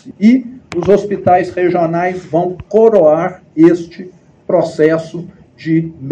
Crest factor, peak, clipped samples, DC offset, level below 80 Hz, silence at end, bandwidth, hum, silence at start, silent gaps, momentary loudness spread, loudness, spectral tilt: 12 dB; 0 dBFS; 0.4%; under 0.1%; -48 dBFS; 0 s; 8.4 kHz; none; 0.05 s; none; 12 LU; -13 LUFS; -8 dB/octave